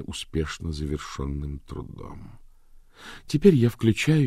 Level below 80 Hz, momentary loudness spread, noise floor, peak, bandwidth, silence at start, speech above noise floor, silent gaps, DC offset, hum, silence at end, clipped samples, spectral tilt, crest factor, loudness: -40 dBFS; 24 LU; -51 dBFS; -4 dBFS; 15 kHz; 0 s; 26 dB; none; under 0.1%; none; 0 s; under 0.1%; -6.5 dB/octave; 20 dB; -25 LUFS